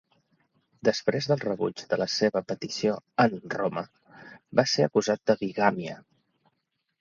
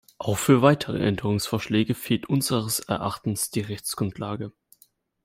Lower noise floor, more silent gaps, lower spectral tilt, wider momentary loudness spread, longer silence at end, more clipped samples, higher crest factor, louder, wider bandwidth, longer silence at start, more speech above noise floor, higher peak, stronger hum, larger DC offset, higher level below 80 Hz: first, -79 dBFS vs -62 dBFS; neither; about the same, -5 dB/octave vs -5 dB/octave; about the same, 9 LU vs 11 LU; first, 1 s vs 0.75 s; neither; about the same, 24 dB vs 22 dB; about the same, -27 LUFS vs -25 LUFS; second, 7.6 kHz vs 16 kHz; first, 0.85 s vs 0.2 s; first, 52 dB vs 37 dB; about the same, -4 dBFS vs -4 dBFS; neither; neither; second, -68 dBFS vs -56 dBFS